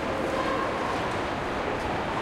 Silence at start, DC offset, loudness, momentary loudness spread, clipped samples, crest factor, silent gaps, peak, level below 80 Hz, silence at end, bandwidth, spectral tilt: 0 s; under 0.1%; -28 LUFS; 2 LU; under 0.1%; 12 dB; none; -16 dBFS; -46 dBFS; 0 s; 16 kHz; -5 dB/octave